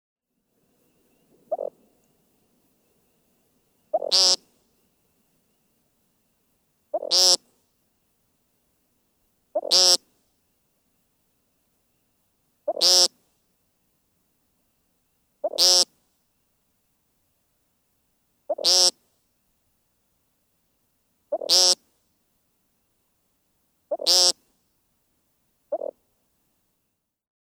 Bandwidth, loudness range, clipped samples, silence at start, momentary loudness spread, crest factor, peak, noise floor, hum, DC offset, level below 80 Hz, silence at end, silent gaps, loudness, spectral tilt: over 20 kHz; 2 LU; under 0.1%; 1.5 s; 18 LU; 26 dB; -2 dBFS; -77 dBFS; none; under 0.1%; -82 dBFS; 1.65 s; none; -19 LUFS; 1.5 dB/octave